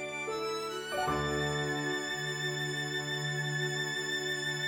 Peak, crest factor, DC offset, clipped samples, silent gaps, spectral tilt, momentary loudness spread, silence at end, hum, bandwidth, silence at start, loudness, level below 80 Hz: -20 dBFS; 14 dB; under 0.1%; under 0.1%; none; -3.5 dB/octave; 3 LU; 0 s; none; over 20 kHz; 0 s; -33 LUFS; -58 dBFS